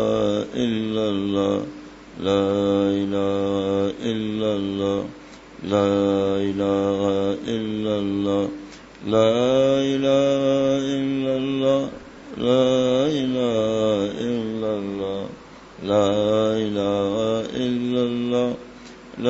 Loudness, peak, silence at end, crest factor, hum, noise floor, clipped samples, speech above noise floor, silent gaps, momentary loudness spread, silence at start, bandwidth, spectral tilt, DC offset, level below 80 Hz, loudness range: -22 LUFS; -6 dBFS; 0 s; 16 dB; none; -42 dBFS; under 0.1%; 21 dB; none; 14 LU; 0 s; 8 kHz; -6.5 dB/octave; under 0.1%; -54 dBFS; 3 LU